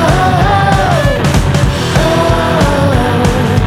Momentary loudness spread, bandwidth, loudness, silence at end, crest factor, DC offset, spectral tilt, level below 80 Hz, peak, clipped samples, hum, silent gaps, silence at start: 2 LU; 16 kHz; -11 LUFS; 0 s; 10 dB; under 0.1%; -6 dB/octave; -20 dBFS; 0 dBFS; under 0.1%; none; none; 0 s